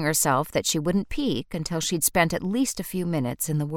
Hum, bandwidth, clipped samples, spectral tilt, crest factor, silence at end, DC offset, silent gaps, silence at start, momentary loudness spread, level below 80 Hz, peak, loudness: none; 17.5 kHz; under 0.1%; -4 dB/octave; 20 dB; 0 s; under 0.1%; none; 0 s; 6 LU; -46 dBFS; -6 dBFS; -25 LUFS